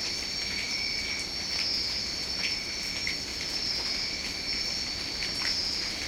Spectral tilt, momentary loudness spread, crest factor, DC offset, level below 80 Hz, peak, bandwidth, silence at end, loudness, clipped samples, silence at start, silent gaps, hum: -1 dB/octave; 3 LU; 16 dB; under 0.1%; -50 dBFS; -14 dBFS; 16.5 kHz; 0 s; -29 LUFS; under 0.1%; 0 s; none; none